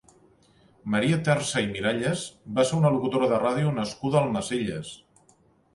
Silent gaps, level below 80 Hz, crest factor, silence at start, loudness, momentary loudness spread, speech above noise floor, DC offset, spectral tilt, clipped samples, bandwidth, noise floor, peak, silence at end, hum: none; -58 dBFS; 18 dB; 0.85 s; -25 LUFS; 9 LU; 37 dB; under 0.1%; -5.5 dB/octave; under 0.1%; 11.5 kHz; -62 dBFS; -8 dBFS; 0.8 s; none